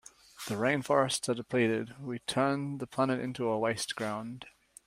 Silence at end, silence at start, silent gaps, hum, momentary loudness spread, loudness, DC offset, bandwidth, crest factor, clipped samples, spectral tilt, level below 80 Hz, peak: 0.4 s; 0.4 s; none; none; 12 LU; -31 LUFS; under 0.1%; 16 kHz; 20 dB; under 0.1%; -4.5 dB/octave; -70 dBFS; -12 dBFS